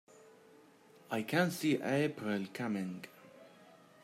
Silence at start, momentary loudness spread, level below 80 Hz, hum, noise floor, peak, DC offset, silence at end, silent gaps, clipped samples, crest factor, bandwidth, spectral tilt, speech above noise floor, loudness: 1.1 s; 15 LU; -82 dBFS; none; -62 dBFS; -18 dBFS; under 0.1%; 0.3 s; none; under 0.1%; 20 dB; 16 kHz; -5.5 dB/octave; 27 dB; -35 LUFS